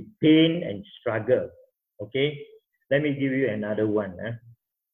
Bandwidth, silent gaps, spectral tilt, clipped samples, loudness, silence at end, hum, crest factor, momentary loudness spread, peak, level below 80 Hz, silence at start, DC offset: 3.8 kHz; none; -9.5 dB/octave; under 0.1%; -25 LUFS; 0.45 s; none; 18 dB; 17 LU; -8 dBFS; -62 dBFS; 0 s; under 0.1%